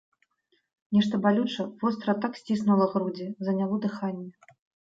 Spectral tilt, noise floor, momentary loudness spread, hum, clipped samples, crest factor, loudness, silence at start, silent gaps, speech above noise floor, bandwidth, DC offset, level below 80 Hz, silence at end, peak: -7.5 dB/octave; -73 dBFS; 10 LU; none; under 0.1%; 18 dB; -27 LUFS; 0.9 s; none; 46 dB; 7.6 kHz; under 0.1%; -70 dBFS; 0.55 s; -10 dBFS